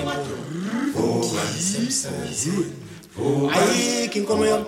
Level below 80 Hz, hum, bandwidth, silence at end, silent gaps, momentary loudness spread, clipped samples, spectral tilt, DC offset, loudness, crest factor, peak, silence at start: -56 dBFS; none; 16.5 kHz; 0 s; none; 10 LU; under 0.1%; -4 dB/octave; under 0.1%; -23 LUFS; 16 dB; -6 dBFS; 0 s